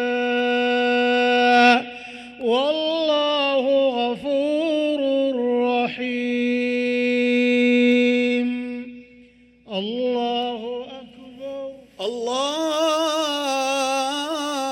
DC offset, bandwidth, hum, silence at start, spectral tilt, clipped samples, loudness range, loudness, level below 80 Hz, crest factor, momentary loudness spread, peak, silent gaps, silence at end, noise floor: under 0.1%; 14 kHz; none; 0 s; -3 dB/octave; under 0.1%; 8 LU; -20 LUFS; -64 dBFS; 18 dB; 15 LU; -4 dBFS; none; 0 s; -51 dBFS